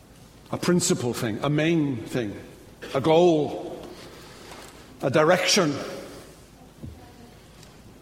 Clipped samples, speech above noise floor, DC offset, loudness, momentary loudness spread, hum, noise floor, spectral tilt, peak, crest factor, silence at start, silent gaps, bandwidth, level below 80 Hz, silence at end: under 0.1%; 27 dB; under 0.1%; -23 LUFS; 24 LU; none; -49 dBFS; -4.5 dB/octave; -4 dBFS; 22 dB; 0.5 s; none; 16 kHz; -56 dBFS; 0.1 s